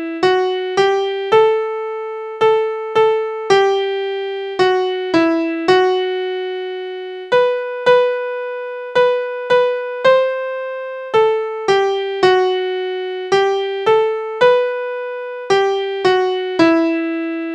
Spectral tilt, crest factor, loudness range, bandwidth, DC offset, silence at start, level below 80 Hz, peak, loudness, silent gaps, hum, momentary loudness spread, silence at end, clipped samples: -4.5 dB/octave; 16 dB; 2 LU; 9.2 kHz; under 0.1%; 0 s; -60 dBFS; 0 dBFS; -17 LUFS; none; none; 10 LU; 0 s; under 0.1%